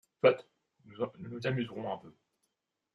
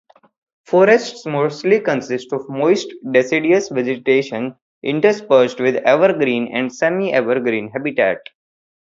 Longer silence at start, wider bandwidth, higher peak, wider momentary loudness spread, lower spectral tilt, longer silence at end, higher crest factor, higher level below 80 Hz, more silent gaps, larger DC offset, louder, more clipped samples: second, 0.25 s vs 0.7 s; about the same, 7.6 kHz vs 7.8 kHz; second, -10 dBFS vs 0 dBFS; about the same, 12 LU vs 10 LU; first, -7.5 dB/octave vs -5.5 dB/octave; first, 0.85 s vs 0.6 s; first, 24 dB vs 16 dB; second, -76 dBFS vs -66 dBFS; second, none vs 4.62-4.82 s; neither; second, -34 LUFS vs -17 LUFS; neither